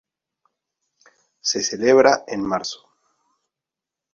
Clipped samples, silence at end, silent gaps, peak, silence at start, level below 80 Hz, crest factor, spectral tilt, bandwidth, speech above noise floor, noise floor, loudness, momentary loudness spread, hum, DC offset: under 0.1%; 1.4 s; none; -2 dBFS; 1.45 s; -62 dBFS; 22 dB; -2.5 dB/octave; 7.6 kHz; 68 dB; -87 dBFS; -19 LUFS; 14 LU; none; under 0.1%